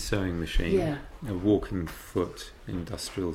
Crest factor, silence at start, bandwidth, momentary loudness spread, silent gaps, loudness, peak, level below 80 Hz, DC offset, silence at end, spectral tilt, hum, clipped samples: 18 dB; 0 s; 16.5 kHz; 11 LU; none; -30 LUFS; -12 dBFS; -38 dBFS; under 0.1%; 0 s; -6 dB/octave; none; under 0.1%